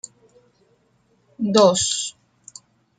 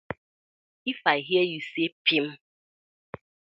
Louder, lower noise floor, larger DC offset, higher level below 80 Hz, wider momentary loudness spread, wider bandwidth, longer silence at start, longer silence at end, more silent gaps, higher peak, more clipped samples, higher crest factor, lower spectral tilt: first, -19 LUFS vs -26 LUFS; second, -63 dBFS vs under -90 dBFS; neither; first, -62 dBFS vs -68 dBFS; first, 27 LU vs 22 LU; first, 9.6 kHz vs 7.4 kHz; first, 1.4 s vs 0.1 s; second, 0.9 s vs 1.2 s; second, none vs 0.18-0.85 s, 1.92-2.05 s; about the same, -2 dBFS vs -4 dBFS; neither; about the same, 22 dB vs 24 dB; second, -3.5 dB/octave vs -6 dB/octave